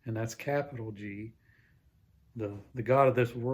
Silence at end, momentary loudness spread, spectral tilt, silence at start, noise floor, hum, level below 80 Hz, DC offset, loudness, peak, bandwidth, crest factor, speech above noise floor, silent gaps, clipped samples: 0 s; 19 LU; -7 dB/octave; 0.05 s; -65 dBFS; none; -64 dBFS; under 0.1%; -31 LUFS; -10 dBFS; 16 kHz; 22 dB; 34 dB; none; under 0.1%